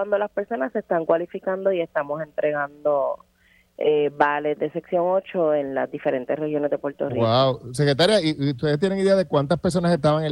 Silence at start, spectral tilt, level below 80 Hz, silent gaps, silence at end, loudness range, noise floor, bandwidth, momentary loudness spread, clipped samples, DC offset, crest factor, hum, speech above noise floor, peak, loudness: 0 s; -6 dB/octave; -56 dBFS; none; 0 s; 4 LU; -59 dBFS; 12 kHz; 7 LU; under 0.1%; under 0.1%; 20 dB; none; 38 dB; -4 dBFS; -22 LUFS